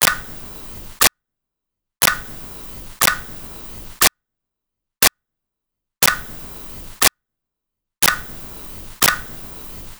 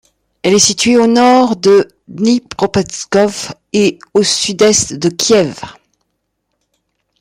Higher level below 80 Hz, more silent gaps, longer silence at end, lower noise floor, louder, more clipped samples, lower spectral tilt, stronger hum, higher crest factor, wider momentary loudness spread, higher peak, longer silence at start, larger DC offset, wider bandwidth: first, -42 dBFS vs -50 dBFS; neither; second, 0.05 s vs 1.5 s; first, -80 dBFS vs -69 dBFS; second, -16 LUFS vs -12 LUFS; neither; second, -0.5 dB/octave vs -3.5 dB/octave; neither; first, 22 dB vs 14 dB; first, 15 LU vs 10 LU; about the same, 0 dBFS vs 0 dBFS; second, 0 s vs 0.45 s; neither; first, over 20 kHz vs 16 kHz